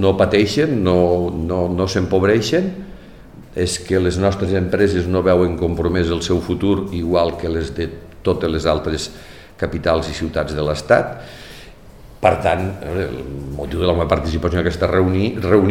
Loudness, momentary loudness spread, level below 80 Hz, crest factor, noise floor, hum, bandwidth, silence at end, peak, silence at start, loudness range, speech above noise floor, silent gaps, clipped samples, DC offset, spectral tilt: -18 LUFS; 11 LU; -34 dBFS; 18 dB; -41 dBFS; none; 15.5 kHz; 0 s; 0 dBFS; 0 s; 4 LU; 23 dB; none; under 0.1%; 0.4%; -6 dB/octave